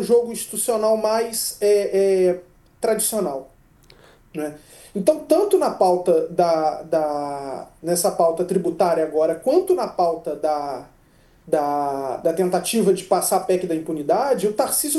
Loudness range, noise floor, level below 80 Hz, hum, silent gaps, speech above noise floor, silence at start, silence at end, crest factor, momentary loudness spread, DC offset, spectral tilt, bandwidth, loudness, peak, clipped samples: 3 LU; -54 dBFS; -58 dBFS; none; none; 34 dB; 0 s; 0 s; 18 dB; 10 LU; under 0.1%; -4.5 dB/octave; 13 kHz; -21 LUFS; -4 dBFS; under 0.1%